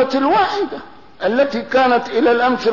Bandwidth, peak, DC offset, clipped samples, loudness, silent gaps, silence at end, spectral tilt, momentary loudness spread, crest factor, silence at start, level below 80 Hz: 6 kHz; -6 dBFS; 0.7%; under 0.1%; -16 LUFS; none; 0 s; -5 dB/octave; 9 LU; 10 dB; 0 s; -54 dBFS